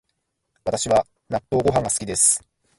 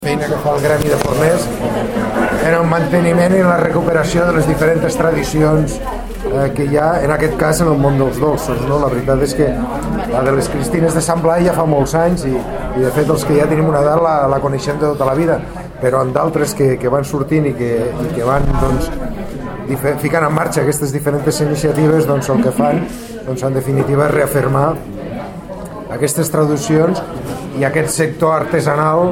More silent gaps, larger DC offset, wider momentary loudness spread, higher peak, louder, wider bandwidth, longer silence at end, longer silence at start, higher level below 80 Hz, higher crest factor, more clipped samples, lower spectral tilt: neither; neither; first, 12 LU vs 8 LU; second, -4 dBFS vs 0 dBFS; second, -20 LUFS vs -15 LUFS; second, 11.5 kHz vs 17 kHz; first, 0.4 s vs 0 s; first, 0.65 s vs 0 s; second, -48 dBFS vs -30 dBFS; first, 20 dB vs 14 dB; neither; second, -3.5 dB/octave vs -6 dB/octave